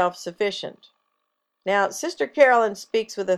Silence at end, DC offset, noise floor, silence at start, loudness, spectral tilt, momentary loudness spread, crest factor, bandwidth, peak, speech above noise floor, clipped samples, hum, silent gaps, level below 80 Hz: 0 s; under 0.1%; -77 dBFS; 0 s; -22 LUFS; -3 dB/octave; 15 LU; 20 dB; 13.5 kHz; -4 dBFS; 54 dB; under 0.1%; none; none; -72 dBFS